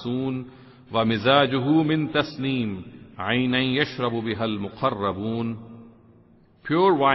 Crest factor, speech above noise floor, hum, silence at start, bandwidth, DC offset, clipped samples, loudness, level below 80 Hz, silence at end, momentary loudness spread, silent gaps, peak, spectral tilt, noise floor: 18 dB; 32 dB; none; 0 s; 6 kHz; under 0.1%; under 0.1%; -24 LUFS; -58 dBFS; 0 s; 13 LU; none; -6 dBFS; -8 dB/octave; -55 dBFS